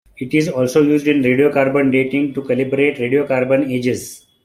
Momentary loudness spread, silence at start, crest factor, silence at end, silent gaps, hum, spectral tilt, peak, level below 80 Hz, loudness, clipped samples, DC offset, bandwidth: 6 LU; 0.2 s; 14 dB; 0.3 s; none; none; -6.5 dB/octave; -2 dBFS; -56 dBFS; -16 LUFS; under 0.1%; under 0.1%; 15.5 kHz